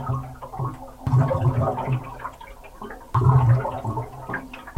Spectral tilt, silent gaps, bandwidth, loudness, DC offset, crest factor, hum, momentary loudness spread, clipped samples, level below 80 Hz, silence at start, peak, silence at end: -9 dB/octave; none; 8.2 kHz; -24 LUFS; under 0.1%; 18 dB; none; 20 LU; under 0.1%; -42 dBFS; 0 s; -6 dBFS; 0.05 s